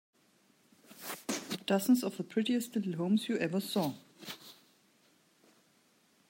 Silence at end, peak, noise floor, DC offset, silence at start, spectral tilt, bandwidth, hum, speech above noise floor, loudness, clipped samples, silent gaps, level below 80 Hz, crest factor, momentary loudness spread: 1.75 s; -18 dBFS; -69 dBFS; under 0.1%; 0.9 s; -5 dB/octave; 16.5 kHz; none; 37 dB; -33 LUFS; under 0.1%; none; -84 dBFS; 18 dB; 17 LU